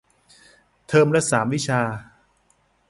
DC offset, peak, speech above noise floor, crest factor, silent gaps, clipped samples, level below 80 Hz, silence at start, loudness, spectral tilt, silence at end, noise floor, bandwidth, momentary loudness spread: under 0.1%; -4 dBFS; 44 dB; 18 dB; none; under 0.1%; -58 dBFS; 0.9 s; -20 LUFS; -5 dB/octave; 0.85 s; -63 dBFS; 11.5 kHz; 9 LU